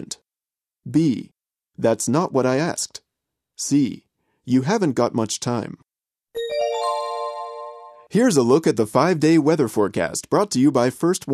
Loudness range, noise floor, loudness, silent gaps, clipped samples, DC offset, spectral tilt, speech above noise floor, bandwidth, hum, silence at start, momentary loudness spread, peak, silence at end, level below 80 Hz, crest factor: 5 LU; under -90 dBFS; -21 LUFS; none; under 0.1%; under 0.1%; -5.5 dB/octave; over 71 dB; 14 kHz; none; 0 s; 16 LU; -2 dBFS; 0 s; -64 dBFS; 18 dB